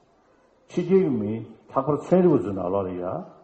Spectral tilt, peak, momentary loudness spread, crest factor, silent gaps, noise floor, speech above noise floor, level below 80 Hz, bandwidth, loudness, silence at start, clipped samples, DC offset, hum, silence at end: -9.5 dB/octave; -6 dBFS; 12 LU; 18 dB; none; -60 dBFS; 37 dB; -60 dBFS; 8.2 kHz; -24 LUFS; 0.7 s; under 0.1%; under 0.1%; none; 0.15 s